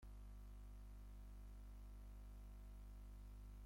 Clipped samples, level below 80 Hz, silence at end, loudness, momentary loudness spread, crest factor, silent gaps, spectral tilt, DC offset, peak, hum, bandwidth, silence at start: under 0.1%; -56 dBFS; 0 s; -61 LUFS; 0 LU; 6 dB; none; -6.5 dB/octave; under 0.1%; -50 dBFS; 50 Hz at -55 dBFS; 16.5 kHz; 0 s